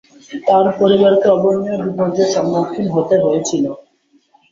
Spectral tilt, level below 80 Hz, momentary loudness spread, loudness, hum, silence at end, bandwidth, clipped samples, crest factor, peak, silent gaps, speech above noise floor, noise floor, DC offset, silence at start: -6 dB/octave; -56 dBFS; 10 LU; -15 LUFS; none; 0.75 s; 7.6 kHz; under 0.1%; 14 dB; 0 dBFS; none; 42 dB; -57 dBFS; under 0.1%; 0.3 s